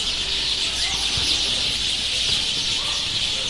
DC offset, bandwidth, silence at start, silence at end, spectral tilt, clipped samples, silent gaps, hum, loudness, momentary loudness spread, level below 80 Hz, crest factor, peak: under 0.1%; 11.5 kHz; 0 s; 0 s; -0.5 dB/octave; under 0.1%; none; none; -20 LUFS; 2 LU; -40 dBFS; 16 dB; -8 dBFS